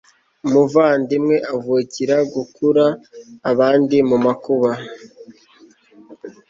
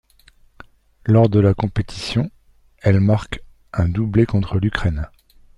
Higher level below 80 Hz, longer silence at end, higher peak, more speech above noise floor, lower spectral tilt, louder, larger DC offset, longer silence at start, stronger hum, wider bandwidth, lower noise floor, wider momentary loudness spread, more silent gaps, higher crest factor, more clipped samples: second, -62 dBFS vs -36 dBFS; second, 0.2 s vs 0.5 s; about the same, -2 dBFS vs 0 dBFS; about the same, 33 dB vs 35 dB; second, -6.5 dB/octave vs -8 dB/octave; about the same, -17 LUFS vs -19 LUFS; neither; second, 0.45 s vs 1.05 s; neither; second, 7.6 kHz vs 10.5 kHz; about the same, -50 dBFS vs -52 dBFS; about the same, 13 LU vs 14 LU; neither; about the same, 16 dB vs 18 dB; neither